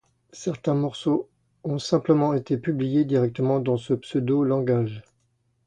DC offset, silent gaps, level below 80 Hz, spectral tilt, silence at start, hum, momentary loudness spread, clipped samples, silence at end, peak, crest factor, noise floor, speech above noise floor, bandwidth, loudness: under 0.1%; none; -62 dBFS; -7.5 dB/octave; 0.35 s; none; 10 LU; under 0.1%; 0.65 s; -6 dBFS; 18 dB; -69 dBFS; 46 dB; 9.8 kHz; -24 LUFS